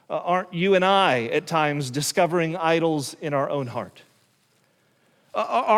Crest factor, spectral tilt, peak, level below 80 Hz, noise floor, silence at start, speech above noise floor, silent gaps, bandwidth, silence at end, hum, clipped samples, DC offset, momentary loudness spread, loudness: 18 dB; -4.5 dB/octave; -6 dBFS; -70 dBFS; -64 dBFS; 0.1 s; 42 dB; none; 16.5 kHz; 0 s; none; under 0.1%; under 0.1%; 11 LU; -23 LUFS